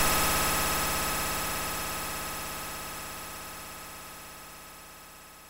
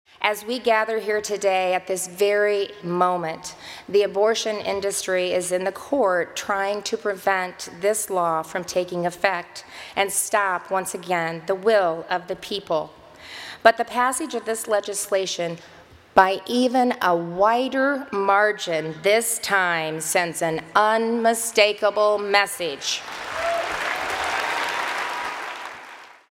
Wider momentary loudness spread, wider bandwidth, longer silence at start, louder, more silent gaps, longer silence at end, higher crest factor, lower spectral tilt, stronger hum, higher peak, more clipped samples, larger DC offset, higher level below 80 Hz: first, 20 LU vs 9 LU; about the same, 16 kHz vs 16.5 kHz; second, 0 s vs 0.2 s; second, -30 LUFS vs -22 LUFS; neither; second, 0 s vs 0.2 s; about the same, 20 dB vs 22 dB; about the same, -2 dB/octave vs -2.5 dB/octave; first, 50 Hz at -50 dBFS vs none; second, -12 dBFS vs 0 dBFS; neither; neither; first, -44 dBFS vs -62 dBFS